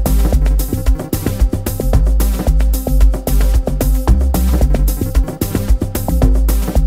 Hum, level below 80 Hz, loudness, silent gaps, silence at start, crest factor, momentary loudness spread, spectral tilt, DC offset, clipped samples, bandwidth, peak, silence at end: none; -14 dBFS; -16 LUFS; none; 0 s; 10 dB; 4 LU; -6.5 dB/octave; under 0.1%; under 0.1%; 16.5 kHz; -2 dBFS; 0 s